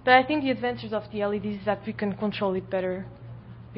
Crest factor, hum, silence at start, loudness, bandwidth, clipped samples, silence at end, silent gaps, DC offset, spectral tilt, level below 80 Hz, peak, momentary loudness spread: 20 dB; none; 0 s; -27 LUFS; 5.8 kHz; under 0.1%; 0 s; none; under 0.1%; -10 dB/octave; -56 dBFS; -6 dBFS; 16 LU